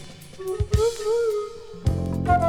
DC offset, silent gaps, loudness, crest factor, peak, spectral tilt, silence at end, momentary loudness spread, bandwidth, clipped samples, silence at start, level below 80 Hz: under 0.1%; none; -25 LUFS; 18 dB; -6 dBFS; -6.5 dB/octave; 0 s; 13 LU; 17 kHz; under 0.1%; 0 s; -34 dBFS